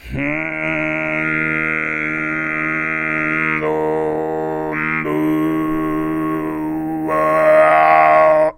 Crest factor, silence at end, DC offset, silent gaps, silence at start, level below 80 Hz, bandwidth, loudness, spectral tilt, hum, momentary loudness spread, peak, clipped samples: 16 dB; 0.05 s; under 0.1%; none; 0.05 s; -44 dBFS; 16.5 kHz; -17 LUFS; -7.5 dB/octave; none; 10 LU; 0 dBFS; under 0.1%